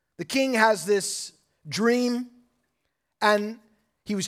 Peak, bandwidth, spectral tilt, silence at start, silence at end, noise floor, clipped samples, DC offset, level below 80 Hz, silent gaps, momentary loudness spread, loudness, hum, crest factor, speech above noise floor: -4 dBFS; 16 kHz; -3.5 dB/octave; 0.2 s; 0 s; -78 dBFS; under 0.1%; under 0.1%; -74 dBFS; none; 15 LU; -24 LUFS; none; 22 dB; 55 dB